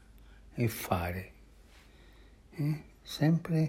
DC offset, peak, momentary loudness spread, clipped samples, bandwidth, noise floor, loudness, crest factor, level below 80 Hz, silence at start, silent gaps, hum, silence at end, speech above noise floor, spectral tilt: under 0.1%; -14 dBFS; 17 LU; under 0.1%; 16 kHz; -57 dBFS; -33 LUFS; 20 dB; -58 dBFS; 0.15 s; none; none; 0 s; 26 dB; -6.5 dB/octave